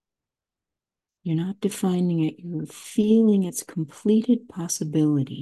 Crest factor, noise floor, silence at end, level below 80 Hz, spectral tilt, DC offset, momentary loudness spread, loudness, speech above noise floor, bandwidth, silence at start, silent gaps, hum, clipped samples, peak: 14 dB; -89 dBFS; 0 s; -68 dBFS; -6.5 dB/octave; under 0.1%; 13 LU; -24 LUFS; 66 dB; 12.5 kHz; 1.25 s; none; none; under 0.1%; -10 dBFS